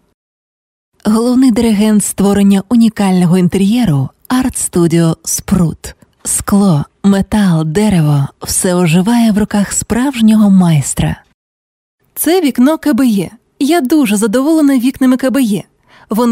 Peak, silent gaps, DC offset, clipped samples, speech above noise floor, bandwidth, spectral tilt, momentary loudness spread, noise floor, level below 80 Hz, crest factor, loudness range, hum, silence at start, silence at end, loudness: 0 dBFS; 11.34-11.98 s; under 0.1%; under 0.1%; over 80 dB; 16.5 kHz; -5.5 dB/octave; 7 LU; under -90 dBFS; -38 dBFS; 10 dB; 2 LU; none; 1.05 s; 0 s; -11 LUFS